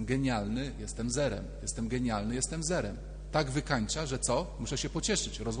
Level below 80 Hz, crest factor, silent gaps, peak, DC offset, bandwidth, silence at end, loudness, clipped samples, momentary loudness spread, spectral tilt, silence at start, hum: -42 dBFS; 20 dB; none; -14 dBFS; under 0.1%; 10 kHz; 0 s; -33 LUFS; under 0.1%; 6 LU; -4 dB/octave; 0 s; none